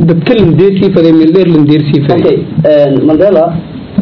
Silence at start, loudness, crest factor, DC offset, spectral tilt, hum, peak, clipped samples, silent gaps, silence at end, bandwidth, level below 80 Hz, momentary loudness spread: 0 s; -7 LUFS; 6 dB; under 0.1%; -10.5 dB/octave; none; 0 dBFS; 5%; none; 0 s; 5.4 kHz; -38 dBFS; 4 LU